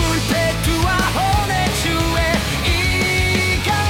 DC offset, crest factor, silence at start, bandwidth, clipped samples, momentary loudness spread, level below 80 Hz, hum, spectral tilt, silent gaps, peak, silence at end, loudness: under 0.1%; 12 dB; 0 s; 18 kHz; under 0.1%; 2 LU; -26 dBFS; none; -4 dB/octave; none; -4 dBFS; 0 s; -17 LUFS